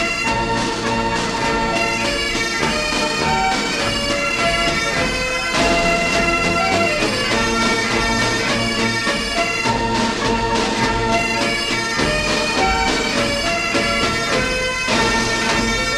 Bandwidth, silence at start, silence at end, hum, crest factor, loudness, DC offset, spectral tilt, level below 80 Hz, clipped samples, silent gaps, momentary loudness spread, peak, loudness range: 16 kHz; 0 s; 0 s; none; 14 dB; -17 LUFS; under 0.1%; -3 dB/octave; -34 dBFS; under 0.1%; none; 3 LU; -4 dBFS; 1 LU